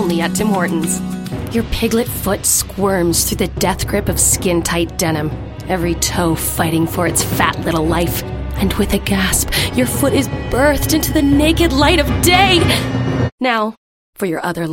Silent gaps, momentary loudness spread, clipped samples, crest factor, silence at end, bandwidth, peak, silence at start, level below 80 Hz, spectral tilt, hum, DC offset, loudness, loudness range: 13.32-13.38 s, 13.78-14.13 s; 8 LU; under 0.1%; 16 dB; 0 s; 17 kHz; 0 dBFS; 0 s; -28 dBFS; -4 dB/octave; none; under 0.1%; -15 LUFS; 4 LU